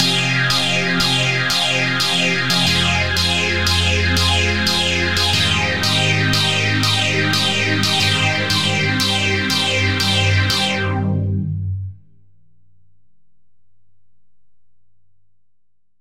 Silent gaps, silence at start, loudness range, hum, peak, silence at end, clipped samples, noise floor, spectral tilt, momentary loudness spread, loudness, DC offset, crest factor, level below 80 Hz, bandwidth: none; 0 s; 7 LU; none; -2 dBFS; 0 s; under 0.1%; -70 dBFS; -3.5 dB/octave; 4 LU; -16 LUFS; 1%; 16 dB; -44 dBFS; 16.5 kHz